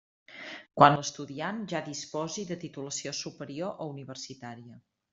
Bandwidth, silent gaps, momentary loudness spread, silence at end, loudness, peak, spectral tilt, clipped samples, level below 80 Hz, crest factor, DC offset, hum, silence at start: 7.8 kHz; none; 22 LU; 0.35 s; -30 LUFS; -2 dBFS; -4 dB/octave; under 0.1%; -70 dBFS; 28 dB; under 0.1%; none; 0.3 s